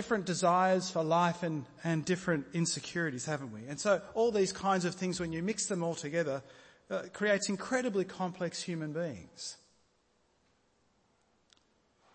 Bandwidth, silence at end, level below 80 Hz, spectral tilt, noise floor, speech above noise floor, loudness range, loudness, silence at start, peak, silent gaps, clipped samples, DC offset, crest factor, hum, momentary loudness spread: 8.8 kHz; 2.6 s; -68 dBFS; -4.5 dB/octave; -73 dBFS; 40 dB; 10 LU; -33 LUFS; 0 s; -16 dBFS; none; under 0.1%; under 0.1%; 18 dB; none; 10 LU